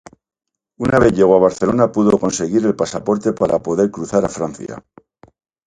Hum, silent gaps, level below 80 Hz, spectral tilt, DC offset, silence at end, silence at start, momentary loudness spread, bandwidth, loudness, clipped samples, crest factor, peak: none; none; -44 dBFS; -6 dB/octave; under 0.1%; 0.85 s; 0.8 s; 12 LU; 11 kHz; -16 LUFS; under 0.1%; 16 dB; 0 dBFS